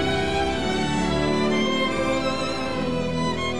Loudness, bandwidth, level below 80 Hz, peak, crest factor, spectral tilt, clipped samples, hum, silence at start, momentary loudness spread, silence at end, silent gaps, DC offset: -23 LUFS; 12.5 kHz; -40 dBFS; -10 dBFS; 12 dB; -5 dB/octave; under 0.1%; none; 0 s; 4 LU; 0 s; none; 1%